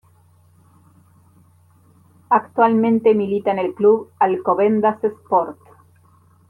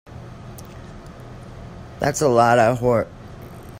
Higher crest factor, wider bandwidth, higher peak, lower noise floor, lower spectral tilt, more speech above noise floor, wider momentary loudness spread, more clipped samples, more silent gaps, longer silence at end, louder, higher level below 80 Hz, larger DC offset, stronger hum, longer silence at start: about the same, 16 dB vs 18 dB; second, 4.3 kHz vs 16 kHz; about the same, -4 dBFS vs -4 dBFS; first, -53 dBFS vs -38 dBFS; first, -9 dB/octave vs -5.5 dB/octave; first, 36 dB vs 21 dB; second, 5 LU vs 24 LU; neither; neither; first, 0.95 s vs 0 s; about the same, -18 LUFS vs -18 LUFS; second, -68 dBFS vs -46 dBFS; neither; neither; first, 2.3 s vs 0.1 s